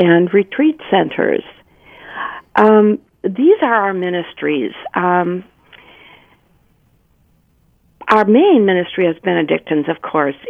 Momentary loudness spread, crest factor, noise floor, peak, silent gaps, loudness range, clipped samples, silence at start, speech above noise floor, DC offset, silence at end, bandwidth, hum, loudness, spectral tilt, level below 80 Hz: 12 LU; 16 dB; -56 dBFS; 0 dBFS; none; 8 LU; under 0.1%; 0 s; 42 dB; under 0.1%; 0 s; 5.2 kHz; none; -15 LUFS; -8.5 dB/octave; -60 dBFS